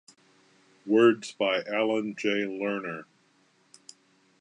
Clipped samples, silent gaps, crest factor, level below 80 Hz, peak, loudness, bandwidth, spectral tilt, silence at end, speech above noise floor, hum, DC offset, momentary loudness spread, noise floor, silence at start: under 0.1%; none; 20 dB; -82 dBFS; -8 dBFS; -27 LUFS; 10.5 kHz; -5 dB/octave; 1.35 s; 39 dB; none; under 0.1%; 15 LU; -66 dBFS; 0.85 s